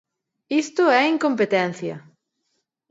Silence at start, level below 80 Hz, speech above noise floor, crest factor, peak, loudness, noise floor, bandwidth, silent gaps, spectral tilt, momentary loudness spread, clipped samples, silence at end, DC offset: 0.5 s; -76 dBFS; 54 dB; 18 dB; -6 dBFS; -20 LUFS; -74 dBFS; 8 kHz; none; -5 dB/octave; 15 LU; under 0.1%; 0.9 s; under 0.1%